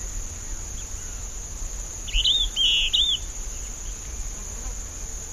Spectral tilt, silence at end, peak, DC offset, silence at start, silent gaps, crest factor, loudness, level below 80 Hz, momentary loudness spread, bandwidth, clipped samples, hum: 0 dB/octave; 0 s; -10 dBFS; 0.3%; 0 s; none; 18 dB; -25 LUFS; -34 dBFS; 15 LU; 15 kHz; under 0.1%; none